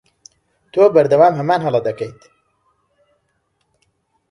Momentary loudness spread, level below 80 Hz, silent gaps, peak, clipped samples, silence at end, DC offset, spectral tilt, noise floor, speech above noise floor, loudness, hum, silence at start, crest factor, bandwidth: 14 LU; -62 dBFS; none; 0 dBFS; under 0.1%; 2.2 s; under 0.1%; -7.5 dB/octave; -67 dBFS; 53 dB; -15 LUFS; none; 0.75 s; 18 dB; 10.5 kHz